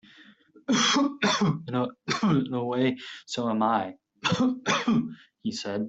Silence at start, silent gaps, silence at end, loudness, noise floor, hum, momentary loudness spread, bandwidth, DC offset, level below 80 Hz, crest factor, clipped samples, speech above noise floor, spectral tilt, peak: 0.2 s; none; 0 s; -26 LUFS; -55 dBFS; none; 11 LU; 8.2 kHz; under 0.1%; -66 dBFS; 16 dB; under 0.1%; 28 dB; -4.5 dB/octave; -10 dBFS